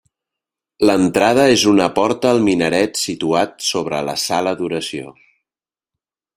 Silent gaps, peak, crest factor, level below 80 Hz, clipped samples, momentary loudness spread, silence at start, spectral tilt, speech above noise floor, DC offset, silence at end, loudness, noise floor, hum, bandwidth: none; 0 dBFS; 16 dB; -54 dBFS; under 0.1%; 9 LU; 0.8 s; -4 dB/octave; over 74 dB; under 0.1%; 1.25 s; -16 LUFS; under -90 dBFS; none; 16 kHz